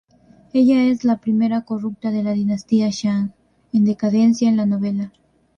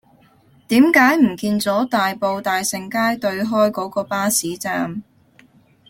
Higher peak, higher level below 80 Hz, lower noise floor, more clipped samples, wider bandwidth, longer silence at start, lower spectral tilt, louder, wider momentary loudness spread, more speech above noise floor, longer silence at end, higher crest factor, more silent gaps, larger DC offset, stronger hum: second, -6 dBFS vs -2 dBFS; about the same, -60 dBFS vs -60 dBFS; about the same, -51 dBFS vs -53 dBFS; neither; second, 7.2 kHz vs 17 kHz; second, 0.55 s vs 0.7 s; first, -7 dB/octave vs -4 dB/octave; about the same, -19 LUFS vs -18 LUFS; about the same, 8 LU vs 10 LU; about the same, 34 dB vs 35 dB; second, 0.5 s vs 0.9 s; second, 12 dB vs 18 dB; neither; neither; neither